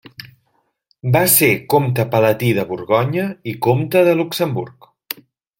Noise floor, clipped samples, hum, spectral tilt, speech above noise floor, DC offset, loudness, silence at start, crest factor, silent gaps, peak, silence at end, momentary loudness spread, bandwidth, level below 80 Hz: -65 dBFS; under 0.1%; none; -5 dB/octave; 49 dB; under 0.1%; -16 LUFS; 0.2 s; 18 dB; none; 0 dBFS; 0.45 s; 18 LU; 17 kHz; -54 dBFS